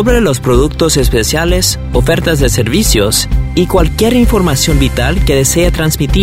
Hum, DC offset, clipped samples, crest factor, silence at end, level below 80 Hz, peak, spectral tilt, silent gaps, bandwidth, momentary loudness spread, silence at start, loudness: none; 1%; under 0.1%; 10 dB; 0 s; -16 dBFS; 0 dBFS; -4.5 dB/octave; none; 16.5 kHz; 2 LU; 0 s; -11 LUFS